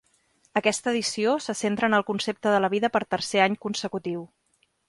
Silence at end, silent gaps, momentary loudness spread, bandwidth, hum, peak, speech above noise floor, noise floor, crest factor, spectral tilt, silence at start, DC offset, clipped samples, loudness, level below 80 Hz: 0.6 s; none; 7 LU; 11.5 kHz; none; -6 dBFS; 41 dB; -66 dBFS; 20 dB; -3.5 dB/octave; 0.55 s; under 0.1%; under 0.1%; -25 LUFS; -66 dBFS